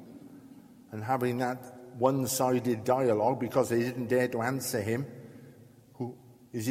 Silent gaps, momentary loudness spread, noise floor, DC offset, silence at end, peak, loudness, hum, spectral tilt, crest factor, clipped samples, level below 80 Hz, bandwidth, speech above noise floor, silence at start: none; 19 LU; -55 dBFS; under 0.1%; 0 s; -10 dBFS; -30 LUFS; none; -5.5 dB/octave; 20 dB; under 0.1%; -70 dBFS; 16.5 kHz; 26 dB; 0 s